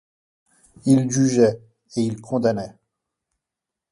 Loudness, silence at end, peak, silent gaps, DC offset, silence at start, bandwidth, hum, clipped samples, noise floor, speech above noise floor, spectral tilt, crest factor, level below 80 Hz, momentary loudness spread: -21 LUFS; 1.2 s; -4 dBFS; none; under 0.1%; 0.85 s; 11.5 kHz; none; under 0.1%; -86 dBFS; 67 dB; -6.5 dB/octave; 20 dB; -60 dBFS; 14 LU